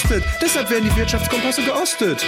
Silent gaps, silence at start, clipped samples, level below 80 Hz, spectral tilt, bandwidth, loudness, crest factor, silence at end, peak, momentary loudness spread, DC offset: none; 0 s; under 0.1%; -26 dBFS; -4 dB/octave; 16.5 kHz; -18 LUFS; 12 dB; 0 s; -6 dBFS; 1 LU; under 0.1%